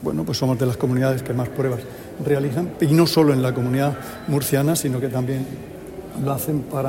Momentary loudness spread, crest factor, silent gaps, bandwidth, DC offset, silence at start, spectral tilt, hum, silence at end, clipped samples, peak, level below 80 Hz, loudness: 13 LU; 16 dB; none; 16.5 kHz; under 0.1%; 0 s; -6 dB/octave; none; 0 s; under 0.1%; -4 dBFS; -50 dBFS; -21 LUFS